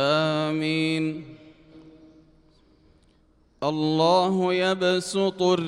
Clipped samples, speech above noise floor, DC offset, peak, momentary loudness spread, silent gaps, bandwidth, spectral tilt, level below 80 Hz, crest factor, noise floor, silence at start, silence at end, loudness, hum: under 0.1%; 38 dB; under 0.1%; -8 dBFS; 10 LU; none; 12 kHz; -5.5 dB/octave; -64 dBFS; 18 dB; -61 dBFS; 0 s; 0 s; -23 LUFS; none